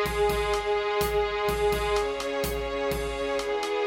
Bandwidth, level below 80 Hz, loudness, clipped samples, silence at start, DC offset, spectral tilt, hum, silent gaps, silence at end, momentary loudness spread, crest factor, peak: 17 kHz; -40 dBFS; -27 LUFS; under 0.1%; 0 s; under 0.1%; -4 dB/octave; none; none; 0 s; 4 LU; 12 dB; -14 dBFS